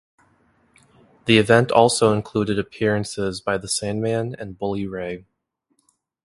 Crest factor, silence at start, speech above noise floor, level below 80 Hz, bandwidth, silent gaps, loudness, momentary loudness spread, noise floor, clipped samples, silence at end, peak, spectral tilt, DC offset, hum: 22 dB; 1.25 s; 52 dB; -52 dBFS; 11.5 kHz; none; -21 LUFS; 15 LU; -72 dBFS; under 0.1%; 1.05 s; 0 dBFS; -4.5 dB/octave; under 0.1%; none